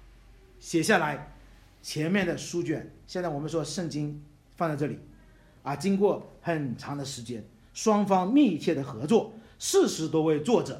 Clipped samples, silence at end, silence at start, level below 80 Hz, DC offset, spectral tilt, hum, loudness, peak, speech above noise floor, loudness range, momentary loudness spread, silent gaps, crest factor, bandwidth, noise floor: under 0.1%; 0 s; 0.6 s; -58 dBFS; under 0.1%; -5 dB/octave; none; -28 LUFS; -8 dBFS; 28 dB; 6 LU; 15 LU; none; 20 dB; 16 kHz; -55 dBFS